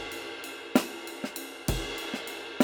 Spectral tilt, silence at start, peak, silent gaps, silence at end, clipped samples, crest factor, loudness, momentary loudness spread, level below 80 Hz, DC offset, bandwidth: -4 dB/octave; 0 s; -6 dBFS; none; 0 s; under 0.1%; 26 dB; -33 LUFS; 9 LU; -46 dBFS; under 0.1%; over 20 kHz